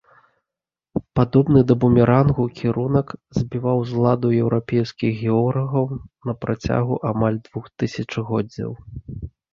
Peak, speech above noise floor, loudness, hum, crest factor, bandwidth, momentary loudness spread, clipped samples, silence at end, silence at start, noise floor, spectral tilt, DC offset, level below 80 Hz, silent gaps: -2 dBFS; 68 dB; -20 LUFS; none; 18 dB; 7 kHz; 15 LU; under 0.1%; 0.25 s; 0.95 s; -88 dBFS; -9 dB/octave; under 0.1%; -44 dBFS; none